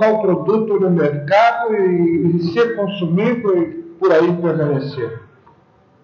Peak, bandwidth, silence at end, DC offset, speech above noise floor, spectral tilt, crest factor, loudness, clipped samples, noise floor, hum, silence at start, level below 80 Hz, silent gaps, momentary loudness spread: -4 dBFS; 6.8 kHz; 0.8 s; under 0.1%; 37 dB; -8.5 dB/octave; 12 dB; -16 LUFS; under 0.1%; -52 dBFS; none; 0 s; -62 dBFS; none; 8 LU